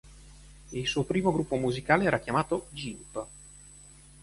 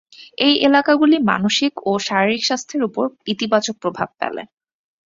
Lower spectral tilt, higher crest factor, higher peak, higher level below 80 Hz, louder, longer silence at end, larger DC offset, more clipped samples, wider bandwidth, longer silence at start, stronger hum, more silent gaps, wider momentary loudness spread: first, -5.5 dB/octave vs -4 dB/octave; first, 24 dB vs 18 dB; second, -8 dBFS vs -2 dBFS; first, -52 dBFS vs -60 dBFS; second, -29 LUFS vs -18 LUFS; second, 0.4 s vs 0.6 s; neither; neither; first, 11.5 kHz vs 7.8 kHz; second, 0.05 s vs 0.2 s; neither; neither; first, 24 LU vs 10 LU